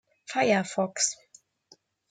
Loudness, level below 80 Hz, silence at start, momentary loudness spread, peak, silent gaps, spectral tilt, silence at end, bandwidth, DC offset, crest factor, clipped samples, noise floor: -27 LUFS; -78 dBFS; 0.3 s; 9 LU; -10 dBFS; none; -3 dB/octave; 0.95 s; 10.5 kHz; under 0.1%; 20 dB; under 0.1%; -62 dBFS